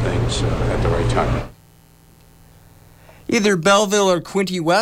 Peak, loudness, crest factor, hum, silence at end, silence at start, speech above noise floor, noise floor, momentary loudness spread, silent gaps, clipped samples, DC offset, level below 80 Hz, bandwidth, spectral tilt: -4 dBFS; -18 LUFS; 14 dB; none; 0 s; 0 s; 32 dB; -49 dBFS; 8 LU; none; under 0.1%; under 0.1%; -30 dBFS; 16 kHz; -5 dB/octave